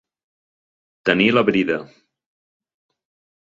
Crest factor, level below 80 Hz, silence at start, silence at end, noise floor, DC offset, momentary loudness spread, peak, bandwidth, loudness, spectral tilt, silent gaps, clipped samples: 24 dB; -60 dBFS; 1.05 s; 1.6 s; under -90 dBFS; under 0.1%; 9 LU; 0 dBFS; 7.6 kHz; -18 LUFS; -6.5 dB/octave; none; under 0.1%